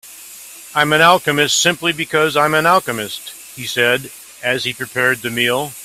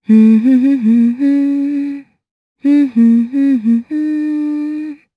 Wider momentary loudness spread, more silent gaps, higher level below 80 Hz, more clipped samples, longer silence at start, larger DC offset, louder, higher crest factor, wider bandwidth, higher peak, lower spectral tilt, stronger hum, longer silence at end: first, 19 LU vs 11 LU; second, none vs 2.31-2.56 s; first, -56 dBFS vs -70 dBFS; neither; about the same, 0.05 s vs 0.1 s; neither; about the same, -15 LUFS vs -13 LUFS; first, 18 dB vs 12 dB; first, 16 kHz vs 5 kHz; about the same, 0 dBFS vs 0 dBFS; second, -2.5 dB/octave vs -9 dB/octave; neither; second, 0 s vs 0.2 s